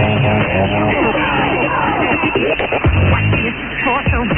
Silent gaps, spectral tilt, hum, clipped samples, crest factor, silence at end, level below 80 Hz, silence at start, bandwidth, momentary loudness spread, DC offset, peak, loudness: none; -10 dB/octave; none; under 0.1%; 12 dB; 0 s; -28 dBFS; 0 s; 3.8 kHz; 2 LU; under 0.1%; -2 dBFS; -15 LUFS